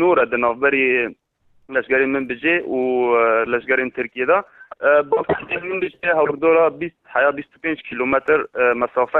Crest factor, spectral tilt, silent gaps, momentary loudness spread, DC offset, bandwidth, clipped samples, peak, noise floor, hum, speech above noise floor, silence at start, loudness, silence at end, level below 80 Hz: 14 dB; -8 dB/octave; none; 9 LU; under 0.1%; 4.1 kHz; under 0.1%; -6 dBFS; -58 dBFS; none; 39 dB; 0 s; -19 LUFS; 0 s; -56 dBFS